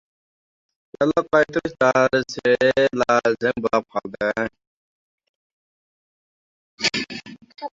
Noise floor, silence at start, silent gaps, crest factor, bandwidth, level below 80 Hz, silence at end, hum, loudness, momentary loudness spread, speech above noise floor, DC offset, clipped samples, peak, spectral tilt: under -90 dBFS; 1 s; 4.67-5.18 s, 5.29-6.77 s; 20 dB; 7.8 kHz; -58 dBFS; 0.05 s; none; -20 LUFS; 11 LU; over 70 dB; under 0.1%; under 0.1%; -4 dBFS; -4.5 dB/octave